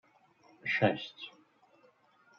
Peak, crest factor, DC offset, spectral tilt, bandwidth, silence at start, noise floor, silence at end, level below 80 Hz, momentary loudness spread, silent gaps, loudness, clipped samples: -14 dBFS; 24 dB; under 0.1%; -3.5 dB/octave; 7 kHz; 0.65 s; -66 dBFS; 1.1 s; -82 dBFS; 19 LU; none; -33 LUFS; under 0.1%